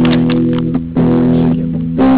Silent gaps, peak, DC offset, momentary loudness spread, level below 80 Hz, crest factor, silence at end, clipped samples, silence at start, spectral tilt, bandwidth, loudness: none; -4 dBFS; under 0.1%; 5 LU; -32 dBFS; 6 dB; 0 s; under 0.1%; 0 s; -12 dB/octave; 4 kHz; -13 LUFS